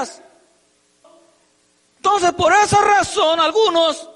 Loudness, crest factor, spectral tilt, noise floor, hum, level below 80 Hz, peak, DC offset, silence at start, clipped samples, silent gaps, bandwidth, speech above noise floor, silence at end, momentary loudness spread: -15 LUFS; 12 dB; -3 dB/octave; -60 dBFS; none; -50 dBFS; -6 dBFS; under 0.1%; 0 s; under 0.1%; none; 11.5 kHz; 44 dB; 0.1 s; 6 LU